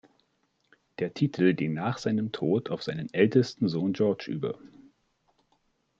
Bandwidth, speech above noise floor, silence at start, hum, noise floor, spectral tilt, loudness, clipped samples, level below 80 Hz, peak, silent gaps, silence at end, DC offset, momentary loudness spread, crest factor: 7.6 kHz; 46 dB; 1 s; none; -73 dBFS; -7.5 dB/octave; -28 LUFS; under 0.1%; -70 dBFS; -8 dBFS; none; 1.3 s; under 0.1%; 11 LU; 22 dB